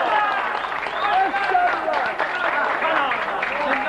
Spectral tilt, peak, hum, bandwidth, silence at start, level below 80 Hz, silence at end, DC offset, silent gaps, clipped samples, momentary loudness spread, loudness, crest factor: -3.5 dB/octave; -8 dBFS; none; 12 kHz; 0 s; -56 dBFS; 0 s; under 0.1%; none; under 0.1%; 4 LU; -21 LUFS; 14 dB